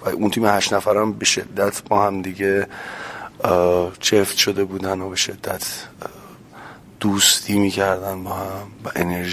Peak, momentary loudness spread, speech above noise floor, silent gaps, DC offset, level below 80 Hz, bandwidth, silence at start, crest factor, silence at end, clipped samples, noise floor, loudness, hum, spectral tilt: 0 dBFS; 15 LU; 21 dB; none; under 0.1%; -48 dBFS; 16 kHz; 0 s; 20 dB; 0 s; under 0.1%; -41 dBFS; -19 LUFS; none; -3 dB/octave